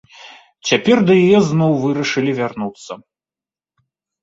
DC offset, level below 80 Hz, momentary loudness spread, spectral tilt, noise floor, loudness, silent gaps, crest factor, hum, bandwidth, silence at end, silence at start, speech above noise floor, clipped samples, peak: under 0.1%; -56 dBFS; 18 LU; -6 dB/octave; under -90 dBFS; -15 LUFS; none; 16 dB; none; 8 kHz; 1.25 s; 0.25 s; over 75 dB; under 0.1%; -2 dBFS